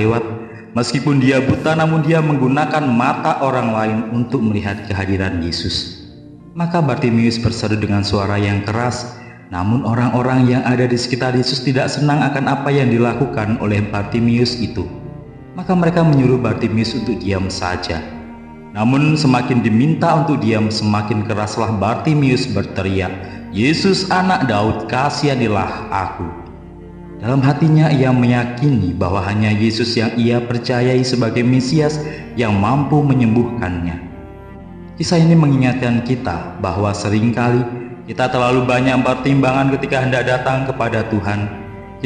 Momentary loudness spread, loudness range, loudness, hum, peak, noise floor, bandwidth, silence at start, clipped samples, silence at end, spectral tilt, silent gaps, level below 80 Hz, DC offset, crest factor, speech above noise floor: 12 LU; 3 LU; -16 LUFS; none; -2 dBFS; -37 dBFS; 10 kHz; 0 s; under 0.1%; 0 s; -6.5 dB/octave; none; -42 dBFS; under 0.1%; 14 dB; 22 dB